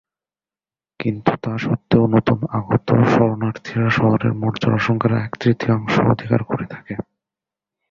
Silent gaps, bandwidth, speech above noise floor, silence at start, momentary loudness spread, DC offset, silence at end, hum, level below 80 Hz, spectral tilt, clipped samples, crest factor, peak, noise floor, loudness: none; 7.2 kHz; over 72 dB; 1 s; 11 LU; under 0.1%; 0.9 s; none; -48 dBFS; -8 dB/octave; under 0.1%; 18 dB; 0 dBFS; under -90 dBFS; -19 LUFS